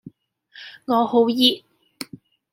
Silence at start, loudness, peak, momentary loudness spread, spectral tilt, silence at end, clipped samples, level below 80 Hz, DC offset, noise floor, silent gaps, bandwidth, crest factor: 0.55 s; -18 LUFS; -2 dBFS; 22 LU; -4 dB/octave; 0.95 s; under 0.1%; -74 dBFS; under 0.1%; -53 dBFS; none; 16.5 kHz; 22 dB